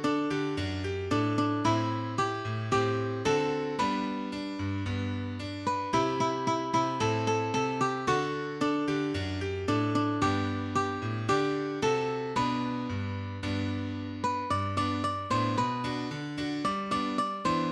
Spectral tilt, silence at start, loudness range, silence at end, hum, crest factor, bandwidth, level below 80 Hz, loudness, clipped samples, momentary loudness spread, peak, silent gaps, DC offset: -6 dB/octave; 0 s; 2 LU; 0 s; none; 16 dB; 11.5 kHz; -58 dBFS; -30 LUFS; under 0.1%; 6 LU; -14 dBFS; none; under 0.1%